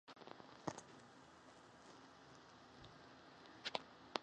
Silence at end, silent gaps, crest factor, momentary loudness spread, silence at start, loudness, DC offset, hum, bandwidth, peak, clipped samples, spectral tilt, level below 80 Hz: 0 s; none; 38 dB; 15 LU; 0.05 s; -55 LUFS; under 0.1%; none; 10 kHz; -18 dBFS; under 0.1%; -3.5 dB/octave; -82 dBFS